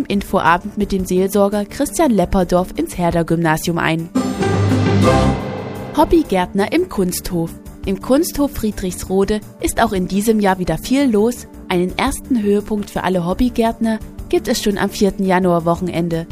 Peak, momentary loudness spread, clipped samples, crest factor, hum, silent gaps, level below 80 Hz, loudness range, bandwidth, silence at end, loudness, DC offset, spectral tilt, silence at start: 0 dBFS; 7 LU; under 0.1%; 16 dB; none; none; -32 dBFS; 2 LU; 15.5 kHz; 0 s; -17 LUFS; under 0.1%; -6 dB/octave; 0 s